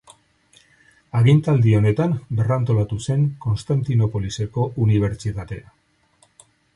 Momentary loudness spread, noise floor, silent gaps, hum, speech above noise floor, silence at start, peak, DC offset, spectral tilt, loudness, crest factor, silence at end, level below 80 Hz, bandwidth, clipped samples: 11 LU; -60 dBFS; none; none; 41 dB; 1.15 s; -4 dBFS; under 0.1%; -8 dB/octave; -20 LUFS; 16 dB; 1.15 s; -44 dBFS; 11 kHz; under 0.1%